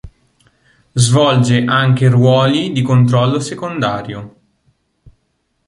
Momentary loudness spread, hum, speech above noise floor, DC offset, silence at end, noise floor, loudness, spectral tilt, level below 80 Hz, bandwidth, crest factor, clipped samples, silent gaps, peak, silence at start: 12 LU; none; 53 dB; under 0.1%; 1.4 s; -65 dBFS; -13 LUFS; -6 dB/octave; -48 dBFS; 11.5 kHz; 14 dB; under 0.1%; none; 0 dBFS; 0.05 s